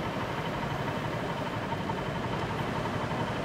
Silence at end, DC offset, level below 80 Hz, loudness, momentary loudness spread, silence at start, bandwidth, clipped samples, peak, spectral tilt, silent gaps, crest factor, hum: 0 s; under 0.1%; -50 dBFS; -33 LUFS; 1 LU; 0 s; 16 kHz; under 0.1%; -18 dBFS; -6 dB/octave; none; 14 dB; none